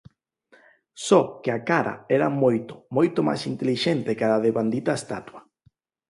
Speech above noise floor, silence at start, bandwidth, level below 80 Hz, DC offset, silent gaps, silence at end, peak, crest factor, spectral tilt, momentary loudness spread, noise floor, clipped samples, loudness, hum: 41 dB; 0.95 s; 11.5 kHz; -66 dBFS; under 0.1%; none; 0.7 s; -4 dBFS; 20 dB; -6 dB/octave; 9 LU; -64 dBFS; under 0.1%; -23 LUFS; none